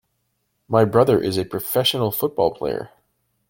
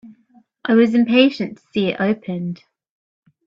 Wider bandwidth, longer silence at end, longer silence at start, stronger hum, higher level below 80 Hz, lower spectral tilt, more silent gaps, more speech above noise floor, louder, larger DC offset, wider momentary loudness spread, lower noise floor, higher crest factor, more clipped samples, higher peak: first, 17 kHz vs 7 kHz; second, 0.6 s vs 0.9 s; first, 0.7 s vs 0.05 s; neither; first, -54 dBFS vs -64 dBFS; second, -5.5 dB/octave vs -7.5 dB/octave; neither; first, 52 dB vs 38 dB; about the same, -20 LUFS vs -18 LUFS; neither; second, 11 LU vs 15 LU; first, -71 dBFS vs -55 dBFS; about the same, 20 dB vs 18 dB; neither; about the same, -2 dBFS vs 0 dBFS